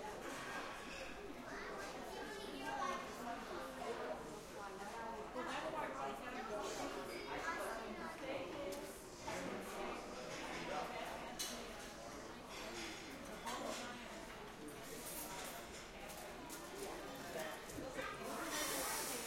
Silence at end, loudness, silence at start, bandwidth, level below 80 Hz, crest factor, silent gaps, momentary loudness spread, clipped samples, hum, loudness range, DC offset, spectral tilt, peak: 0 s; -47 LUFS; 0 s; 16.5 kHz; -66 dBFS; 18 dB; none; 7 LU; under 0.1%; none; 3 LU; under 0.1%; -2.5 dB/octave; -30 dBFS